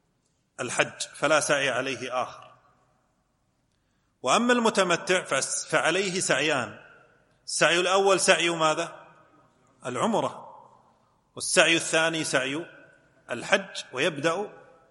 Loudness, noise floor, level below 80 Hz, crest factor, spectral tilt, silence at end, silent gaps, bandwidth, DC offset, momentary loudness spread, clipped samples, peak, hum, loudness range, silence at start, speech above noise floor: -25 LUFS; -71 dBFS; -74 dBFS; 24 dB; -2.5 dB/octave; 0.3 s; none; 12 kHz; under 0.1%; 15 LU; under 0.1%; -2 dBFS; none; 5 LU; 0.6 s; 46 dB